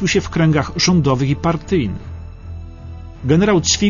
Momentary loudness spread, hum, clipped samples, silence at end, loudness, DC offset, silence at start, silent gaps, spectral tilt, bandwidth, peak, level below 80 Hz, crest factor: 20 LU; none; under 0.1%; 0 s; -16 LUFS; under 0.1%; 0 s; none; -5 dB/octave; 7.4 kHz; -2 dBFS; -34 dBFS; 14 dB